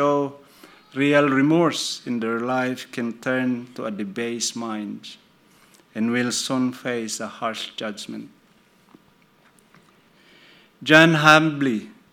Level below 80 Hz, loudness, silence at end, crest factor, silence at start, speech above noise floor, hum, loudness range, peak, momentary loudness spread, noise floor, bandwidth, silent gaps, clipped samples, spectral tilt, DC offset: -72 dBFS; -21 LUFS; 0.2 s; 24 dB; 0 s; 36 dB; none; 13 LU; 0 dBFS; 18 LU; -57 dBFS; 17 kHz; none; under 0.1%; -4.5 dB/octave; under 0.1%